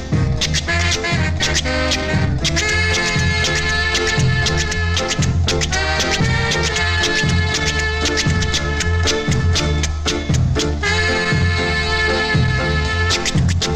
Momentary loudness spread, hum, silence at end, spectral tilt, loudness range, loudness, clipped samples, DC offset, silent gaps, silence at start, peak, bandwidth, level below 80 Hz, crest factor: 2 LU; none; 0 s; -4 dB/octave; 1 LU; -17 LUFS; under 0.1%; 0.4%; none; 0 s; -4 dBFS; 13.5 kHz; -28 dBFS; 12 dB